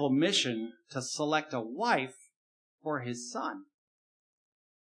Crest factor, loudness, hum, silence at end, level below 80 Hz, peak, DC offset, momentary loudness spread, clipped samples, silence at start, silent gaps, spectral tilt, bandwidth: 22 dB; -32 LUFS; none; 1.35 s; under -90 dBFS; -12 dBFS; under 0.1%; 13 LU; under 0.1%; 0 s; 2.36-2.78 s; -3.5 dB/octave; 10.5 kHz